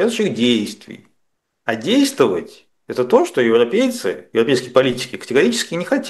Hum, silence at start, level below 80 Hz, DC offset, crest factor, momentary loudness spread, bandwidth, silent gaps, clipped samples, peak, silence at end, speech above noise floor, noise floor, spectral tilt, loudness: none; 0 s; -62 dBFS; under 0.1%; 18 dB; 11 LU; 12.5 kHz; none; under 0.1%; 0 dBFS; 0 s; 53 dB; -70 dBFS; -4.5 dB/octave; -17 LUFS